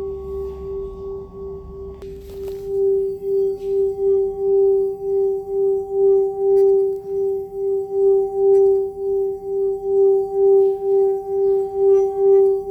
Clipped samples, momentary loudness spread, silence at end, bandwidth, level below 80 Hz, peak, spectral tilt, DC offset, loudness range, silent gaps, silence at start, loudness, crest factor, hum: under 0.1%; 16 LU; 0 s; 2 kHz; -46 dBFS; -8 dBFS; -9.5 dB/octave; under 0.1%; 6 LU; none; 0 s; -18 LUFS; 12 dB; none